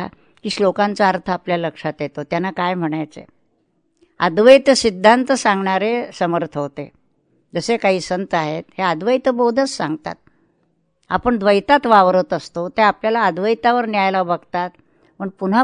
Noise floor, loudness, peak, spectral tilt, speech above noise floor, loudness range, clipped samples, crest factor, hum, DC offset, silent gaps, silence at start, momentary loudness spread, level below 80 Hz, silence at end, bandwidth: -64 dBFS; -17 LUFS; 0 dBFS; -5 dB/octave; 48 dB; 6 LU; under 0.1%; 18 dB; none; under 0.1%; none; 0 s; 14 LU; -54 dBFS; 0 s; 10.5 kHz